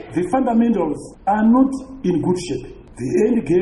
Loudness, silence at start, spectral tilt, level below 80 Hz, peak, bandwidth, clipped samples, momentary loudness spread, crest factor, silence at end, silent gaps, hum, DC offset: -19 LUFS; 0 s; -7 dB/octave; -44 dBFS; -4 dBFS; 11.5 kHz; under 0.1%; 12 LU; 14 dB; 0 s; none; none; under 0.1%